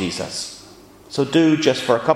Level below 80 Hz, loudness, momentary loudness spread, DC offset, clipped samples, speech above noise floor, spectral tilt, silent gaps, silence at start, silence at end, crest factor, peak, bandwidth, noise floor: -56 dBFS; -19 LUFS; 15 LU; under 0.1%; under 0.1%; 26 dB; -5 dB/octave; none; 0 s; 0 s; 18 dB; 0 dBFS; 13.5 kHz; -44 dBFS